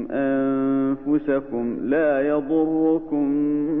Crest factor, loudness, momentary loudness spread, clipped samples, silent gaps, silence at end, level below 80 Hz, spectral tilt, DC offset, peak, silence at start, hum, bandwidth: 12 dB; -22 LUFS; 4 LU; under 0.1%; none; 0 s; -52 dBFS; -11 dB/octave; under 0.1%; -10 dBFS; 0 s; none; 3.8 kHz